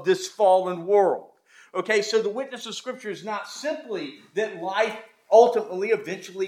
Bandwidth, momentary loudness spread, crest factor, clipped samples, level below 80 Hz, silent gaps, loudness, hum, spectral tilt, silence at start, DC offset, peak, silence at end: 14.5 kHz; 14 LU; 22 dB; under 0.1%; -88 dBFS; none; -24 LUFS; none; -3.5 dB/octave; 0 s; under 0.1%; -2 dBFS; 0 s